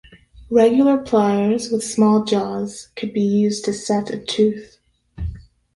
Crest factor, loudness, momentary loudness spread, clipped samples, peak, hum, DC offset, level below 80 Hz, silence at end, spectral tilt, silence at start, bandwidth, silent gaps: 16 dB; -19 LUFS; 15 LU; under 0.1%; -2 dBFS; none; under 0.1%; -42 dBFS; 0.35 s; -5.5 dB/octave; 0.35 s; 11.5 kHz; none